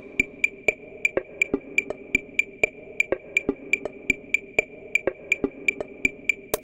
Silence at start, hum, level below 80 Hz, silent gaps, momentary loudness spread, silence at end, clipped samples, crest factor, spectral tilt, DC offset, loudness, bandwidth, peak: 0 s; none; -52 dBFS; none; 3 LU; 0.05 s; under 0.1%; 24 dB; -3 dB/octave; under 0.1%; -25 LUFS; 17 kHz; -4 dBFS